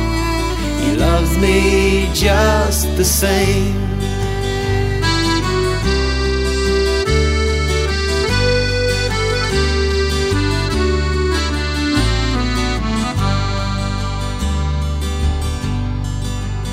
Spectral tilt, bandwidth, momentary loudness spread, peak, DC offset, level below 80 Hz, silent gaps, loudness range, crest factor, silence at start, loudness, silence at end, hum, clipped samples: -5 dB/octave; 16 kHz; 7 LU; -2 dBFS; under 0.1%; -20 dBFS; none; 5 LU; 14 dB; 0 s; -17 LUFS; 0 s; none; under 0.1%